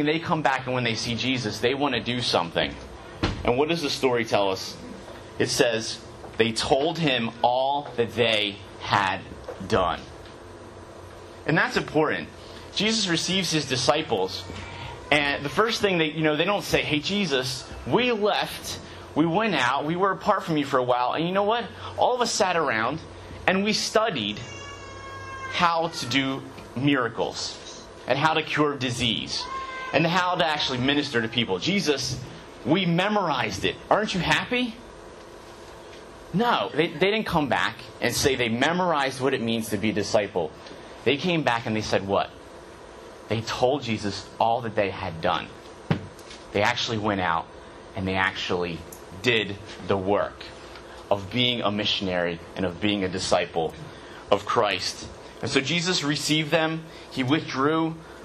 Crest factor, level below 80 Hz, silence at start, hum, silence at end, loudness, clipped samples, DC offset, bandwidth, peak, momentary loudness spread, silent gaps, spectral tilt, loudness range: 24 dB; -52 dBFS; 0 s; none; 0 s; -25 LUFS; under 0.1%; under 0.1%; 13.5 kHz; -2 dBFS; 17 LU; none; -4 dB/octave; 3 LU